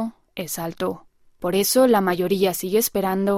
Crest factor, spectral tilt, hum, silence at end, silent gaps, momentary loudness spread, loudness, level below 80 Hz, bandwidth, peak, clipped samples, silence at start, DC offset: 16 dB; -4.5 dB/octave; none; 0 s; none; 14 LU; -21 LUFS; -58 dBFS; 16 kHz; -6 dBFS; under 0.1%; 0 s; under 0.1%